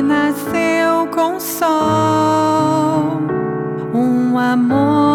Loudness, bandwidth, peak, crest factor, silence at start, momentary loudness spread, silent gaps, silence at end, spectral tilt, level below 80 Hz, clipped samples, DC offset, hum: -15 LUFS; 18.5 kHz; 0 dBFS; 14 dB; 0 s; 5 LU; none; 0 s; -6 dB/octave; -56 dBFS; under 0.1%; under 0.1%; none